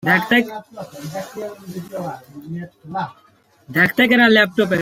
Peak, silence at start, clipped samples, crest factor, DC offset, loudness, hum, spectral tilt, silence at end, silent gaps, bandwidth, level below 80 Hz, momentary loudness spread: -2 dBFS; 0.05 s; under 0.1%; 18 dB; under 0.1%; -16 LUFS; none; -5.5 dB/octave; 0 s; none; 16.5 kHz; -60 dBFS; 20 LU